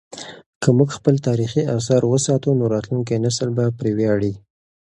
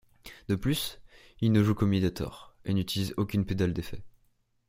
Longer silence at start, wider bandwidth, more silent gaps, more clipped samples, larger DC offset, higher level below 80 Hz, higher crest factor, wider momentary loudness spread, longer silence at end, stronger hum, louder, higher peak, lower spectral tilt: second, 0.1 s vs 0.25 s; second, 11 kHz vs 16.5 kHz; first, 0.46-0.61 s vs none; neither; neither; about the same, -52 dBFS vs -50 dBFS; about the same, 18 dB vs 20 dB; second, 8 LU vs 17 LU; about the same, 0.5 s vs 0.6 s; neither; first, -19 LUFS vs -29 LUFS; first, 0 dBFS vs -10 dBFS; about the same, -6.5 dB/octave vs -6.5 dB/octave